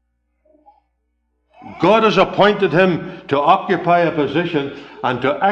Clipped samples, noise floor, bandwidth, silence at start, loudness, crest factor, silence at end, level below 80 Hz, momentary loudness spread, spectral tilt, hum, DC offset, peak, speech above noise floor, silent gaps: under 0.1%; -68 dBFS; 8.2 kHz; 1.65 s; -16 LUFS; 16 dB; 0 s; -54 dBFS; 9 LU; -6.5 dB/octave; none; under 0.1%; -2 dBFS; 53 dB; none